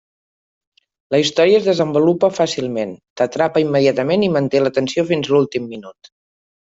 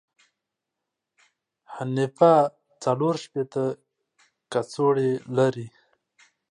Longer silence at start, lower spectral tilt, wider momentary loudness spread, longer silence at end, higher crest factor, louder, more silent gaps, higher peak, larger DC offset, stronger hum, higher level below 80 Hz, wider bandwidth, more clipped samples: second, 1.1 s vs 1.7 s; second, -5.5 dB/octave vs -7 dB/octave; second, 9 LU vs 17 LU; about the same, 0.9 s vs 0.8 s; about the same, 16 dB vs 20 dB; first, -17 LUFS vs -24 LUFS; first, 3.10-3.16 s vs none; first, -2 dBFS vs -6 dBFS; neither; neither; first, -60 dBFS vs -74 dBFS; second, 8 kHz vs 10.5 kHz; neither